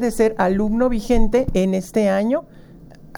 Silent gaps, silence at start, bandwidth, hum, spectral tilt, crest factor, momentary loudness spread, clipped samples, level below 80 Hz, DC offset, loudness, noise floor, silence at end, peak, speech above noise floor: none; 0 s; 17.5 kHz; none; -6.5 dB/octave; 16 dB; 2 LU; under 0.1%; -28 dBFS; under 0.1%; -19 LUFS; -42 dBFS; 0 s; -2 dBFS; 24 dB